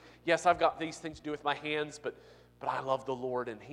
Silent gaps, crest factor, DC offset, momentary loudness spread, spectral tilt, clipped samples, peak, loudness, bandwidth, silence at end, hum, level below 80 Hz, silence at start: none; 22 dB; under 0.1%; 12 LU; -4 dB/octave; under 0.1%; -12 dBFS; -33 LUFS; 11.5 kHz; 0 s; 60 Hz at -65 dBFS; -66 dBFS; 0.05 s